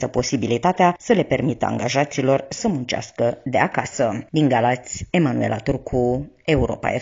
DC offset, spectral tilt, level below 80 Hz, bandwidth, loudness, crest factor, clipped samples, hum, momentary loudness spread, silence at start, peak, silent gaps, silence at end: under 0.1%; -5.5 dB/octave; -42 dBFS; 7.6 kHz; -21 LUFS; 18 dB; under 0.1%; none; 6 LU; 0 s; -2 dBFS; none; 0 s